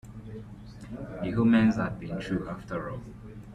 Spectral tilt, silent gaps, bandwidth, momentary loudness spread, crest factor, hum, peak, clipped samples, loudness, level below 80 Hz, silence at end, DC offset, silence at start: -8 dB/octave; none; 8.6 kHz; 22 LU; 16 dB; none; -14 dBFS; under 0.1%; -28 LUFS; -50 dBFS; 0 s; under 0.1%; 0.05 s